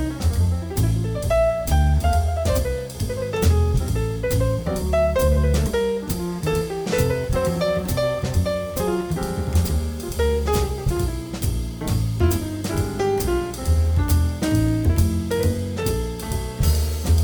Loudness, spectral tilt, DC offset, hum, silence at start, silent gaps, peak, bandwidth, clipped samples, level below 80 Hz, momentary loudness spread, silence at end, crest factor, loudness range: -22 LUFS; -6 dB/octave; under 0.1%; none; 0 s; none; -6 dBFS; over 20 kHz; under 0.1%; -26 dBFS; 6 LU; 0 s; 14 dB; 2 LU